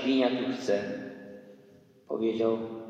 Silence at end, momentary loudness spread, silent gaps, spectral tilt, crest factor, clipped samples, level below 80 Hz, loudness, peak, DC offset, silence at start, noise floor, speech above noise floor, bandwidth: 0 s; 20 LU; none; -5.5 dB/octave; 18 dB; under 0.1%; -80 dBFS; -30 LUFS; -12 dBFS; under 0.1%; 0 s; -57 dBFS; 29 dB; 8.8 kHz